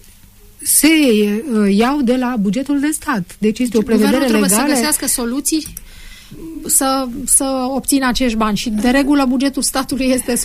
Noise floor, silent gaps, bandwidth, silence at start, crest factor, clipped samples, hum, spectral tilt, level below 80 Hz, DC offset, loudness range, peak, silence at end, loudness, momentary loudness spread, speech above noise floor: -43 dBFS; none; 15.5 kHz; 0.6 s; 14 dB; under 0.1%; none; -3.5 dB/octave; -36 dBFS; under 0.1%; 2 LU; -2 dBFS; 0 s; -15 LUFS; 7 LU; 28 dB